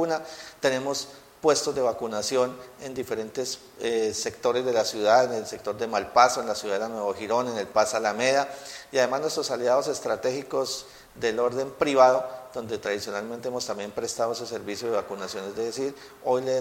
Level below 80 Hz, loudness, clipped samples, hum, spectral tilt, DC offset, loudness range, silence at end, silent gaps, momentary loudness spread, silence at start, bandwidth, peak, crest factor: -64 dBFS; -26 LUFS; under 0.1%; none; -3 dB/octave; under 0.1%; 5 LU; 0 s; none; 12 LU; 0 s; 16.5 kHz; -2 dBFS; 24 dB